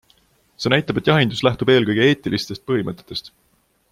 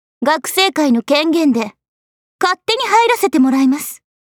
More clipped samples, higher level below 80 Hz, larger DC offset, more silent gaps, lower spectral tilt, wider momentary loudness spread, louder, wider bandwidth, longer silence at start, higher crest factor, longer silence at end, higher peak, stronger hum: neither; first, -52 dBFS vs -68 dBFS; neither; second, none vs 1.88-2.39 s; first, -6 dB/octave vs -2.5 dB/octave; first, 12 LU vs 7 LU; second, -19 LUFS vs -14 LUFS; second, 15 kHz vs 19.5 kHz; first, 0.6 s vs 0.2 s; about the same, 18 dB vs 14 dB; first, 0.65 s vs 0.3 s; about the same, -2 dBFS vs -2 dBFS; neither